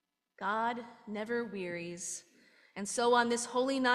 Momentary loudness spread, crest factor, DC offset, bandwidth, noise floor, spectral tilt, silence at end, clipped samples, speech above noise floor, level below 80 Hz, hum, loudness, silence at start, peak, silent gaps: 15 LU; 18 dB; under 0.1%; 13 kHz; -56 dBFS; -3 dB/octave; 0 s; under 0.1%; 23 dB; -80 dBFS; none; -34 LUFS; 0.4 s; -16 dBFS; none